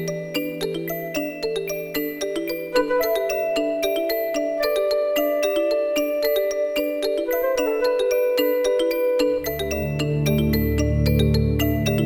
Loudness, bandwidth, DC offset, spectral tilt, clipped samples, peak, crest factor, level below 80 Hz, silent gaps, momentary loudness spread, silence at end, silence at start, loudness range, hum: -22 LUFS; over 20 kHz; under 0.1%; -5.5 dB/octave; under 0.1%; -6 dBFS; 16 dB; -34 dBFS; none; 6 LU; 0 s; 0 s; 3 LU; none